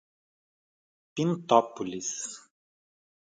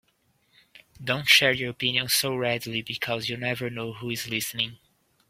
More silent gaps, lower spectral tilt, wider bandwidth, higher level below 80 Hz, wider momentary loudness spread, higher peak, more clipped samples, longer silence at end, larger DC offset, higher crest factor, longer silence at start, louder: neither; first, -4.5 dB/octave vs -2.5 dB/octave; second, 9.6 kHz vs 16.5 kHz; second, -74 dBFS vs -64 dBFS; about the same, 15 LU vs 14 LU; about the same, -4 dBFS vs -2 dBFS; neither; first, 0.85 s vs 0.55 s; neither; about the same, 26 dB vs 26 dB; first, 1.15 s vs 0.75 s; second, -28 LUFS vs -25 LUFS